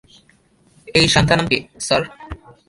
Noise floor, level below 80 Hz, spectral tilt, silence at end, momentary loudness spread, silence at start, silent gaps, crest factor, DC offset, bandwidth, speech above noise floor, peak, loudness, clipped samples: -56 dBFS; -40 dBFS; -4 dB/octave; 0.3 s; 20 LU; 0.85 s; none; 20 dB; under 0.1%; 11.5 kHz; 38 dB; 0 dBFS; -16 LUFS; under 0.1%